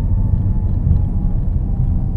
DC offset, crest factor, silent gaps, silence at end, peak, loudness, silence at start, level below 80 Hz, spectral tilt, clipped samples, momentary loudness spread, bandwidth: under 0.1%; 14 dB; none; 0 s; -2 dBFS; -19 LUFS; 0 s; -18 dBFS; -12.5 dB/octave; under 0.1%; 3 LU; 1.9 kHz